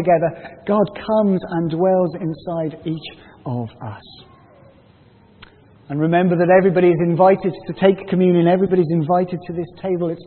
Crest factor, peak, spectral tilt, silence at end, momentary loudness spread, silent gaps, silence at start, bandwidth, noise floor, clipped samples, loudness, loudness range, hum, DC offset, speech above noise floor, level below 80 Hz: 18 dB; -2 dBFS; -13 dB/octave; 0.05 s; 14 LU; none; 0 s; 4.4 kHz; -50 dBFS; under 0.1%; -18 LUFS; 14 LU; none; under 0.1%; 32 dB; -56 dBFS